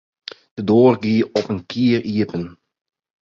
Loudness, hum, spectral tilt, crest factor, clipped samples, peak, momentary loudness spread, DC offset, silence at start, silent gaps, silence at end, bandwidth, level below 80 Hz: -18 LUFS; none; -7.5 dB/octave; 18 dB; under 0.1%; 0 dBFS; 20 LU; under 0.1%; 0.55 s; none; 0.7 s; 7.4 kHz; -54 dBFS